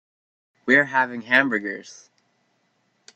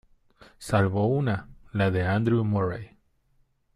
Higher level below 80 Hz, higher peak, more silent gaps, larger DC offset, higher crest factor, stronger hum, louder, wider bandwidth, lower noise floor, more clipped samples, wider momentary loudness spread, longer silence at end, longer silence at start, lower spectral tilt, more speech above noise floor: second, -72 dBFS vs -54 dBFS; first, -2 dBFS vs -10 dBFS; neither; neither; first, 22 dB vs 16 dB; neither; first, -20 LUFS vs -26 LUFS; second, 8.8 kHz vs 12.5 kHz; about the same, -68 dBFS vs -66 dBFS; neither; first, 16 LU vs 10 LU; first, 1.25 s vs 0.9 s; about the same, 0.65 s vs 0.6 s; second, -4.5 dB/octave vs -7.5 dB/octave; first, 47 dB vs 42 dB